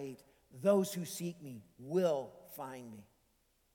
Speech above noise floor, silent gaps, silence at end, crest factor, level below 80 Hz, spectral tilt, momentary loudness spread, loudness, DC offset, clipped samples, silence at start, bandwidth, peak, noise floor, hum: 39 dB; none; 0.7 s; 20 dB; -78 dBFS; -6 dB/octave; 21 LU; -36 LUFS; under 0.1%; under 0.1%; 0 s; 19 kHz; -18 dBFS; -75 dBFS; none